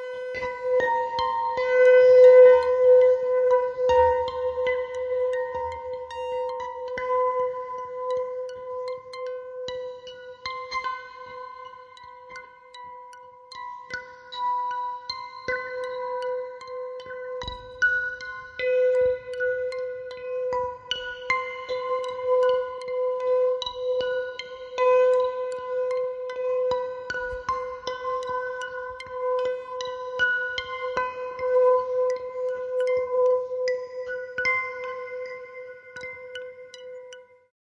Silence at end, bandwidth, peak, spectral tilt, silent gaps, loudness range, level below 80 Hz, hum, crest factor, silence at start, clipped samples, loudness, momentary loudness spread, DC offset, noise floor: 0.45 s; 7.2 kHz; -6 dBFS; -3 dB/octave; none; 16 LU; -58 dBFS; none; 18 dB; 0 s; under 0.1%; -24 LUFS; 18 LU; under 0.1%; -47 dBFS